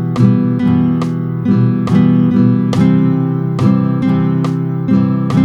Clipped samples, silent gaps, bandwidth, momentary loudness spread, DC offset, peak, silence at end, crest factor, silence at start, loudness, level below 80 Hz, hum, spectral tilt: under 0.1%; none; 8.4 kHz; 5 LU; under 0.1%; 0 dBFS; 0 s; 12 dB; 0 s; -13 LUFS; -48 dBFS; none; -9.5 dB/octave